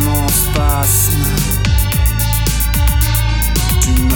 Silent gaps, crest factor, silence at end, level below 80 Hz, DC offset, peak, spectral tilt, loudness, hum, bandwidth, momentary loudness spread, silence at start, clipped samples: none; 12 dB; 0 s; -16 dBFS; under 0.1%; 0 dBFS; -4 dB/octave; -14 LUFS; none; over 20 kHz; 3 LU; 0 s; under 0.1%